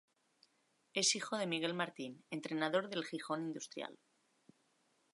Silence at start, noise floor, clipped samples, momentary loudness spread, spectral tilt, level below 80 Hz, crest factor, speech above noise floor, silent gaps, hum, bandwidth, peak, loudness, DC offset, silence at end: 0.95 s; -78 dBFS; under 0.1%; 13 LU; -2.5 dB/octave; under -90 dBFS; 22 dB; 38 dB; none; none; 11.5 kHz; -20 dBFS; -38 LUFS; under 0.1%; 1.2 s